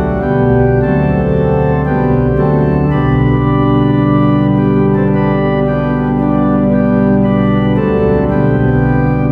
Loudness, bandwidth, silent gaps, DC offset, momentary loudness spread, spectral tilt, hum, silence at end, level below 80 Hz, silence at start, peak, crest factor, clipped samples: -12 LUFS; 4.7 kHz; none; under 0.1%; 2 LU; -11 dB/octave; none; 0 s; -26 dBFS; 0 s; 0 dBFS; 10 dB; under 0.1%